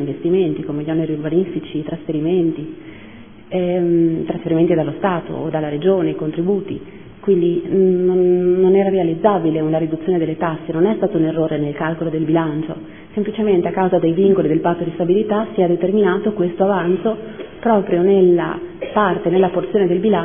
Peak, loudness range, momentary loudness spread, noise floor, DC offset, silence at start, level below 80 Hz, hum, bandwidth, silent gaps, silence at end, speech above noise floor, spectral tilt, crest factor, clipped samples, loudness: 0 dBFS; 4 LU; 9 LU; -39 dBFS; 0.5%; 0 s; -52 dBFS; none; 3.6 kHz; none; 0 s; 22 dB; -12 dB/octave; 16 dB; under 0.1%; -17 LUFS